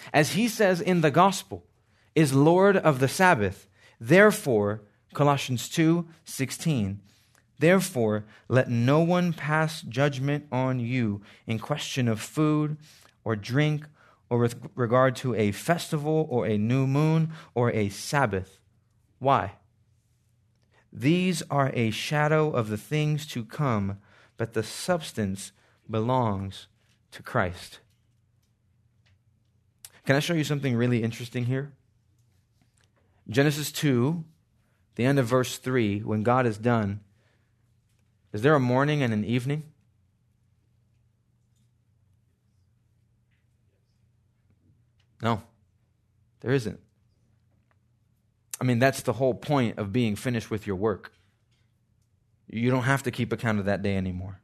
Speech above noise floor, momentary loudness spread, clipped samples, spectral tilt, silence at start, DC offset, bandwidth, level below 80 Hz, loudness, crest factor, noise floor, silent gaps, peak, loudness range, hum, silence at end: 43 dB; 12 LU; under 0.1%; -6 dB/octave; 0 s; under 0.1%; 13.5 kHz; -66 dBFS; -26 LUFS; 22 dB; -68 dBFS; none; -4 dBFS; 11 LU; none; 0.1 s